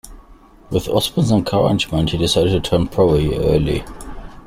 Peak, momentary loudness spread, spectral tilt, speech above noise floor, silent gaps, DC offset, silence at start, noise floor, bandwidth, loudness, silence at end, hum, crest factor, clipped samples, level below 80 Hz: -2 dBFS; 9 LU; -6 dB/octave; 28 dB; none; under 0.1%; 0.05 s; -45 dBFS; 16 kHz; -17 LUFS; 0.05 s; none; 16 dB; under 0.1%; -32 dBFS